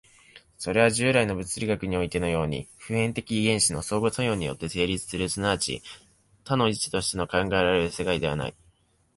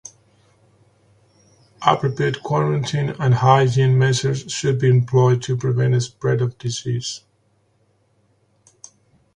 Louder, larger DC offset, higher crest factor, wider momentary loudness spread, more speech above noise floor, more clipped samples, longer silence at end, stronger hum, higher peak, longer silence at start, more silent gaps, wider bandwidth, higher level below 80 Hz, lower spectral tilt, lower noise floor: second, -26 LUFS vs -19 LUFS; neither; about the same, 20 dB vs 20 dB; about the same, 9 LU vs 9 LU; second, 38 dB vs 45 dB; neither; second, 0.65 s vs 2.15 s; neither; second, -8 dBFS vs 0 dBFS; second, 0.35 s vs 1.8 s; neither; first, 11.5 kHz vs 9.8 kHz; first, -48 dBFS vs -54 dBFS; second, -4 dB/octave vs -6 dB/octave; about the same, -64 dBFS vs -63 dBFS